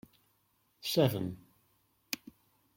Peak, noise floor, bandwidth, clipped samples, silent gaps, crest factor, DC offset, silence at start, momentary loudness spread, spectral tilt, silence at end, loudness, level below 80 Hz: -14 dBFS; -74 dBFS; 16.5 kHz; under 0.1%; none; 24 dB; under 0.1%; 0.85 s; 12 LU; -5.5 dB/octave; 0.6 s; -34 LUFS; -72 dBFS